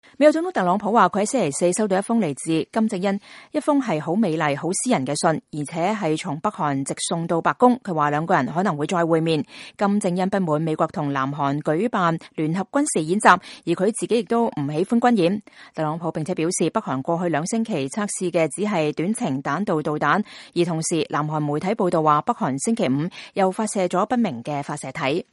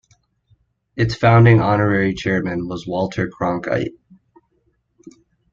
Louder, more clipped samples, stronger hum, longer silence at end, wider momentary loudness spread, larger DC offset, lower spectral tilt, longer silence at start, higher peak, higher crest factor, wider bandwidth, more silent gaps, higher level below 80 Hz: second, -22 LUFS vs -18 LUFS; neither; neither; second, 0.1 s vs 0.45 s; second, 7 LU vs 13 LU; neither; second, -5 dB/octave vs -8 dB/octave; second, 0.2 s vs 0.95 s; about the same, 0 dBFS vs -2 dBFS; about the same, 22 dB vs 18 dB; first, 11.5 kHz vs 7.2 kHz; neither; second, -66 dBFS vs -46 dBFS